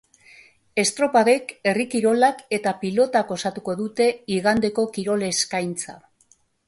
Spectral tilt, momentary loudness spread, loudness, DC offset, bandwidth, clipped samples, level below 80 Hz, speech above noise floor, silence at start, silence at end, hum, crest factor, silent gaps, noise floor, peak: -3.5 dB/octave; 9 LU; -22 LUFS; under 0.1%; 11.5 kHz; under 0.1%; -60 dBFS; 39 dB; 0.75 s; 0.7 s; none; 16 dB; none; -61 dBFS; -6 dBFS